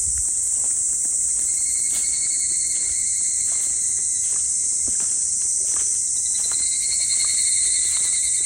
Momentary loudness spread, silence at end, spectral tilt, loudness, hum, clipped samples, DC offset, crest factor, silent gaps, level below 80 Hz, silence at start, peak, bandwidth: 2 LU; 0 s; 2 dB/octave; -18 LUFS; none; under 0.1%; under 0.1%; 14 dB; none; -50 dBFS; 0 s; -8 dBFS; 16.5 kHz